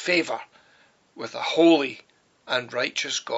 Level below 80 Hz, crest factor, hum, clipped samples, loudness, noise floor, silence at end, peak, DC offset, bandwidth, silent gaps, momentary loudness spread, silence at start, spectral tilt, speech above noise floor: -78 dBFS; 18 dB; none; under 0.1%; -23 LUFS; -60 dBFS; 0 s; -8 dBFS; under 0.1%; 8 kHz; none; 17 LU; 0 s; -1.5 dB/octave; 36 dB